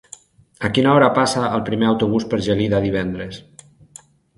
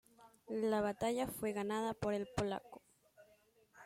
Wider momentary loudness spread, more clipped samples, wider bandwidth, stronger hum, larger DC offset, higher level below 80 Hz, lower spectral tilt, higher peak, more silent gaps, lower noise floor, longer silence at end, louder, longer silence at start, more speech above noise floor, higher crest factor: first, 13 LU vs 10 LU; neither; second, 11.5 kHz vs 16.5 kHz; neither; neither; first, -46 dBFS vs -64 dBFS; about the same, -5.5 dB/octave vs -5.5 dB/octave; first, 0 dBFS vs -22 dBFS; neither; second, -47 dBFS vs -71 dBFS; first, 1 s vs 0 s; first, -18 LUFS vs -39 LUFS; first, 0.6 s vs 0.2 s; about the same, 29 dB vs 32 dB; about the same, 18 dB vs 18 dB